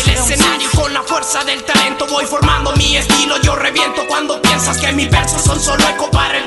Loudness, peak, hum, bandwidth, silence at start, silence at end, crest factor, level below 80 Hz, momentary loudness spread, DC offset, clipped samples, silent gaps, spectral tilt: -13 LUFS; 0 dBFS; none; 12 kHz; 0 s; 0 s; 14 dB; -24 dBFS; 4 LU; under 0.1%; under 0.1%; none; -3 dB/octave